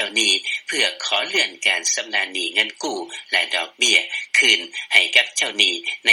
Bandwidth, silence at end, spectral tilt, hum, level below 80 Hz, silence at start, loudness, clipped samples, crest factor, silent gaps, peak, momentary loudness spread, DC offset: 17 kHz; 0 s; 1.5 dB/octave; none; -88 dBFS; 0 s; -18 LUFS; under 0.1%; 20 dB; none; 0 dBFS; 8 LU; under 0.1%